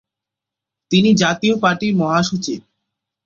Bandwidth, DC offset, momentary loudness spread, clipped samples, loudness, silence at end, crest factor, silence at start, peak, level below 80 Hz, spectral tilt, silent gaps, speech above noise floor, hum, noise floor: 7.6 kHz; under 0.1%; 10 LU; under 0.1%; -16 LUFS; 0.65 s; 18 dB; 0.9 s; 0 dBFS; -54 dBFS; -5 dB/octave; none; 69 dB; none; -85 dBFS